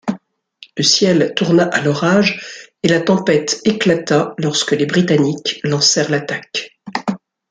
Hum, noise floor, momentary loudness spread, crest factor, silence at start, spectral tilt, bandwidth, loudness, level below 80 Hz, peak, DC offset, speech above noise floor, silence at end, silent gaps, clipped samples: none; -45 dBFS; 13 LU; 16 dB; 0.05 s; -4 dB/octave; 9.6 kHz; -15 LUFS; -58 dBFS; 0 dBFS; under 0.1%; 30 dB; 0.35 s; none; under 0.1%